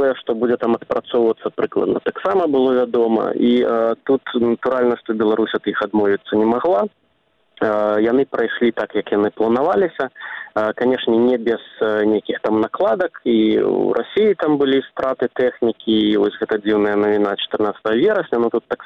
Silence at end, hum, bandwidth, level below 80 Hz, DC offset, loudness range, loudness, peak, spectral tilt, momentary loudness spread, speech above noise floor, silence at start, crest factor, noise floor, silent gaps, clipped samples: 0 s; none; 5.6 kHz; -58 dBFS; under 0.1%; 1 LU; -18 LUFS; -4 dBFS; -7.5 dB/octave; 5 LU; 45 dB; 0 s; 14 dB; -63 dBFS; none; under 0.1%